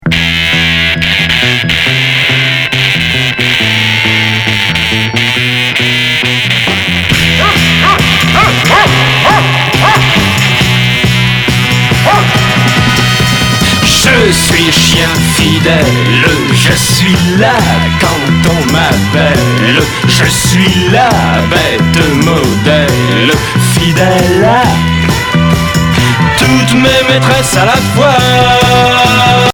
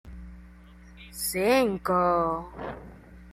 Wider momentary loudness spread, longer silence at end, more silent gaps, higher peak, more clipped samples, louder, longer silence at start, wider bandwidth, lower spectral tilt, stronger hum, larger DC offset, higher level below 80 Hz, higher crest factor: second, 3 LU vs 22 LU; about the same, 0 s vs 0 s; neither; first, 0 dBFS vs -10 dBFS; first, 0.5% vs under 0.1%; first, -7 LUFS vs -25 LUFS; about the same, 0 s vs 0.05 s; first, 19.5 kHz vs 16 kHz; about the same, -4 dB/octave vs -4.5 dB/octave; second, none vs 60 Hz at -45 dBFS; neither; first, -26 dBFS vs -48 dBFS; second, 8 dB vs 20 dB